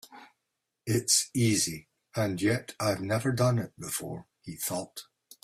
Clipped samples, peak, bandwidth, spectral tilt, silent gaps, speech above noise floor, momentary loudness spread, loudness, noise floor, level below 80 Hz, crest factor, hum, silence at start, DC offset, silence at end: under 0.1%; -10 dBFS; 16 kHz; -4 dB/octave; none; 54 dB; 18 LU; -29 LUFS; -83 dBFS; -62 dBFS; 20 dB; none; 0.1 s; under 0.1%; 0.4 s